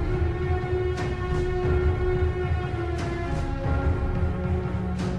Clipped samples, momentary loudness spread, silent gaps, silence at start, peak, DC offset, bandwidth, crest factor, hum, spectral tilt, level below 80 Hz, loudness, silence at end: under 0.1%; 4 LU; none; 0 s; -12 dBFS; 0.5%; 9.4 kHz; 12 dB; none; -8 dB/octave; -30 dBFS; -27 LUFS; 0 s